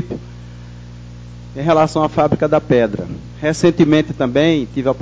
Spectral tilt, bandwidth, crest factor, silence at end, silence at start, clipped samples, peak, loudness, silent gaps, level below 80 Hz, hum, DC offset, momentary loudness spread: -6.5 dB/octave; 8 kHz; 14 dB; 0 s; 0 s; under 0.1%; -2 dBFS; -15 LUFS; none; -40 dBFS; 60 Hz at -35 dBFS; under 0.1%; 22 LU